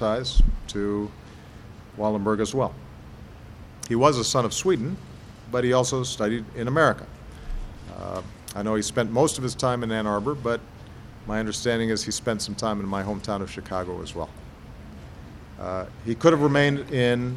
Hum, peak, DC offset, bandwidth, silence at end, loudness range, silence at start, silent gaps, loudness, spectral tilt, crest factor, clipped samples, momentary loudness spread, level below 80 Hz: none; -4 dBFS; under 0.1%; 15 kHz; 0 s; 5 LU; 0 s; none; -25 LUFS; -5 dB/octave; 22 dB; under 0.1%; 23 LU; -34 dBFS